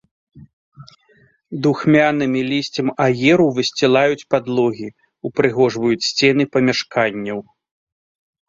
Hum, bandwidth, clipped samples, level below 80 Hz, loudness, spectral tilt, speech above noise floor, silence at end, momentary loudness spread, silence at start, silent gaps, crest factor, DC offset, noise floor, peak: none; 7.8 kHz; under 0.1%; -58 dBFS; -17 LUFS; -5.5 dB/octave; 39 dB; 1.1 s; 12 LU; 0.35 s; 0.53-0.72 s; 18 dB; under 0.1%; -56 dBFS; 0 dBFS